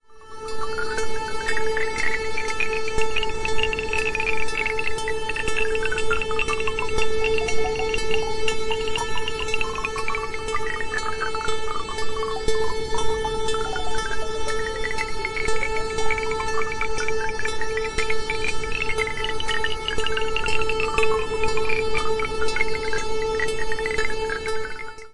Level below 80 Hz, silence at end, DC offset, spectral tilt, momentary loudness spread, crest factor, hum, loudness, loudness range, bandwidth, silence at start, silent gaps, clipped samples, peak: -36 dBFS; 0 s; 2%; -3 dB/octave; 4 LU; 16 dB; none; -25 LUFS; 3 LU; 11 kHz; 0 s; none; under 0.1%; -4 dBFS